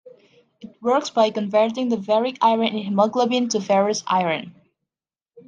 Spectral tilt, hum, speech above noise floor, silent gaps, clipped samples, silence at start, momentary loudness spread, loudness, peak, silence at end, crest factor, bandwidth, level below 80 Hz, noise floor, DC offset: -4.5 dB/octave; none; over 70 dB; none; under 0.1%; 0.05 s; 4 LU; -21 LUFS; -4 dBFS; 0.1 s; 18 dB; 9.4 kHz; -72 dBFS; under -90 dBFS; under 0.1%